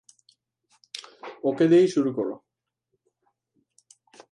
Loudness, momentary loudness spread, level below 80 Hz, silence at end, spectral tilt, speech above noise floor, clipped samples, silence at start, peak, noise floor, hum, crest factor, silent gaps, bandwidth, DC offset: -23 LUFS; 22 LU; -80 dBFS; 1.95 s; -6.5 dB/octave; 58 dB; under 0.1%; 0.95 s; -10 dBFS; -79 dBFS; none; 18 dB; none; 11 kHz; under 0.1%